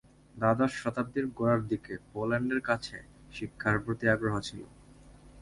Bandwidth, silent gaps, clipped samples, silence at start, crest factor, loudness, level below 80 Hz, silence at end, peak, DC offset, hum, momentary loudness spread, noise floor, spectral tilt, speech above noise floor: 11.5 kHz; none; under 0.1%; 0.35 s; 22 dB; -31 LUFS; -56 dBFS; 0 s; -10 dBFS; under 0.1%; none; 14 LU; -54 dBFS; -6.5 dB/octave; 24 dB